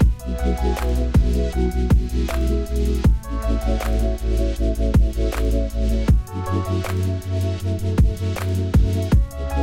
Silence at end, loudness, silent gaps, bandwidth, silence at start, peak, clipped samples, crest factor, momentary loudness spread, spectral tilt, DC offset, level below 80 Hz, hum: 0 s; -22 LUFS; none; 15.5 kHz; 0 s; -6 dBFS; under 0.1%; 14 dB; 5 LU; -7.5 dB/octave; under 0.1%; -22 dBFS; none